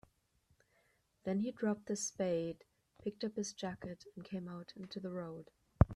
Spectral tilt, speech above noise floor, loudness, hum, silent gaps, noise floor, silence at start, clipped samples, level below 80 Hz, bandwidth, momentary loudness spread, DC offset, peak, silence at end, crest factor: -6 dB/octave; 35 dB; -41 LUFS; none; none; -76 dBFS; 1.25 s; under 0.1%; -52 dBFS; 12.5 kHz; 12 LU; under 0.1%; -10 dBFS; 0 s; 30 dB